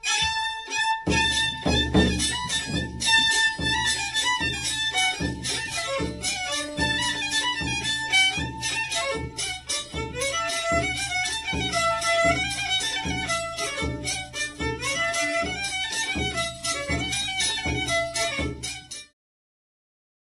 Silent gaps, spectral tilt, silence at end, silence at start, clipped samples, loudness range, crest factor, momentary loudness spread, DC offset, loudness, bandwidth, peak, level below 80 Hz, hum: none; -2.5 dB/octave; 1.3 s; 0.05 s; under 0.1%; 4 LU; 18 dB; 8 LU; under 0.1%; -24 LUFS; 14 kHz; -8 dBFS; -40 dBFS; none